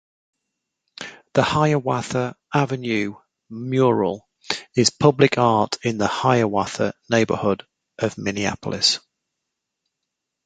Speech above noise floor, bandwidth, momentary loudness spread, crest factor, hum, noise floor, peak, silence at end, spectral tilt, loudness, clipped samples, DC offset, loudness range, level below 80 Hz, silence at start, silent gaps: 61 dB; 9.4 kHz; 11 LU; 20 dB; none; -81 dBFS; -2 dBFS; 1.5 s; -4.5 dB/octave; -21 LUFS; under 0.1%; under 0.1%; 4 LU; -54 dBFS; 1 s; none